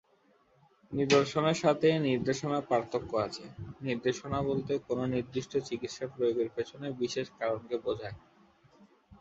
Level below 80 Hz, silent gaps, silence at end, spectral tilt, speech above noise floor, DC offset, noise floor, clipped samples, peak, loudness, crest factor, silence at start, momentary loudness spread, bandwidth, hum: -62 dBFS; none; 0.05 s; -5.5 dB/octave; 36 dB; under 0.1%; -67 dBFS; under 0.1%; -12 dBFS; -32 LUFS; 20 dB; 0.9 s; 12 LU; 8 kHz; none